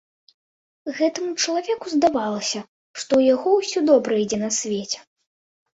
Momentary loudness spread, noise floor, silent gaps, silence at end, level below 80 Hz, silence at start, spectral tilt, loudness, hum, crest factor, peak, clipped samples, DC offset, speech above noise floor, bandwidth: 13 LU; under -90 dBFS; 2.68-2.94 s; 0.75 s; -64 dBFS; 0.85 s; -3.5 dB/octave; -21 LUFS; none; 18 dB; -4 dBFS; under 0.1%; under 0.1%; over 69 dB; 8 kHz